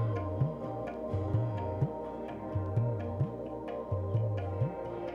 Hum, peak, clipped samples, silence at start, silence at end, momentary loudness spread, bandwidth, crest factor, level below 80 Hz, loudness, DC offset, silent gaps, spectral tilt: none; -18 dBFS; under 0.1%; 0 s; 0 s; 7 LU; 5 kHz; 16 dB; -54 dBFS; -35 LUFS; under 0.1%; none; -10.5 dB/octave